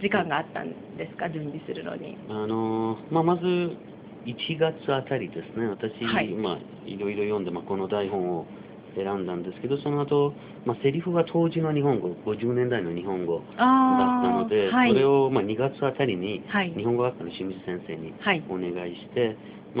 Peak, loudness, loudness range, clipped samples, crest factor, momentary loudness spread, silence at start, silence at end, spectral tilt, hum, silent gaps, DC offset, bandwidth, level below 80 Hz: -6 dBFS; -26 LUFS; 7 LU; under 0.1%; 20 dB; 14 LU; 0 s; 0 s; -5 dB/octave; none; none; under 0.1%; 5 kHz; -64 dBFS